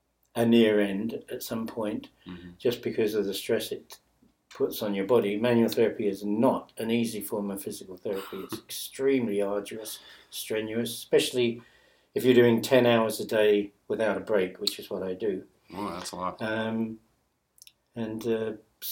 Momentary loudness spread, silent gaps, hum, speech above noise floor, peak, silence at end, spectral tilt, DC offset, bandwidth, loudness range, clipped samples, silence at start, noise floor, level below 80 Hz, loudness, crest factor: 16 LU; none; none; 45 dB; -8 dBFS; 0 s; -5 dB/octave; under 0.1%; 17 kHz; 7 LU; under 0.1%; 0.35 s; -72 dBFS; -66 dBFS; -28 LUFS; 20 dB